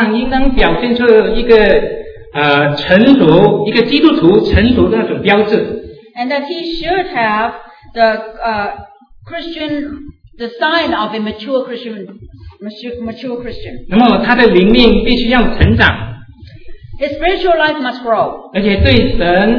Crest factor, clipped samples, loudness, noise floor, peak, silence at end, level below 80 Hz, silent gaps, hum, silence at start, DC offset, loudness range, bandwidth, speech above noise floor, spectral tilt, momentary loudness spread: 12 dB; 0.4%; -12 LUFS; -34 dBFS; 0 dBFS; 0 s; -26 dBFS; none; none; 0 s; under 0.1%; 9 LU; 5.4 kHz; 23 dB; -8 dB/octave; 18 LU